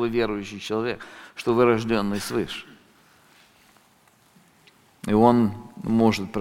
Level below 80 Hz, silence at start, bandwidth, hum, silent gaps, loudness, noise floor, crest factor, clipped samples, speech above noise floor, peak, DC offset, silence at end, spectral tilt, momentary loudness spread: -52 dBFS; 0 s; 16 kHz; none; none; -23 LUFS; -59 dBFS; 22 dB; under 0.1%; 36 dB; -2 dBFS; under 0.1%; 0 s; -6 dB/octave; 16 LU